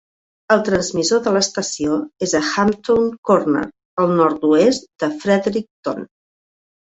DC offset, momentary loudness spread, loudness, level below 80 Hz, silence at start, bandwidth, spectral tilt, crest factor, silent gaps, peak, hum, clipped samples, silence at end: under 0.1%; 9 LU; -18 LUFS; -54 dBFS; 0.5 s; 8.4 kHz; -4.5 dB/octave; 16 dB; 3.18-3.23 s, 3.85-3.97 s, 5.71-5.83 s; -2 dBFS; none; under 0.1%; 0.9 s